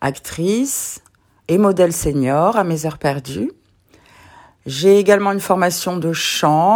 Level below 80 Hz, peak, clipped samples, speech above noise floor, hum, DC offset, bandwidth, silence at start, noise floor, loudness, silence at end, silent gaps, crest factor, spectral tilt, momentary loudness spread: -44 dBFS; 0 dBFS; under 0.1%; 37 dB; none; under 0.1%; 19.5 kHz; 0 s; -52 dBFS; -17 LUFS; 0 s; none; 16 dB; -4.5 dB/octave; 13 LU